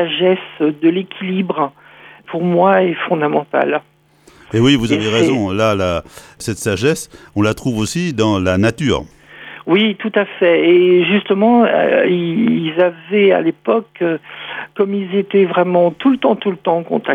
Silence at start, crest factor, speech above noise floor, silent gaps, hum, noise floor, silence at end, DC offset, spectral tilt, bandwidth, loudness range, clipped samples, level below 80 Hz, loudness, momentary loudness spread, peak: 0 s; 14 dB; 33 dB; none; none; -48 dBFS; 0 s; under 0.1%; -6 dB/octave; 13.5 kHz; 4 LU; under 0.1%; -46 dBFS; -15 LUFS; 10 LU; 0 dBFS